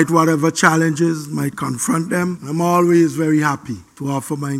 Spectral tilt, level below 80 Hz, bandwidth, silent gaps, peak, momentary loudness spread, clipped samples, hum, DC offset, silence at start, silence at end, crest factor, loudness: -5.5 dB/octave; -58 dBFS; 15.5 kHz; none; 0 dBFS; 10 LU; under 0.1%; none; under 0.1%; 0 s; 0 s; 16 dB; -17 LUFS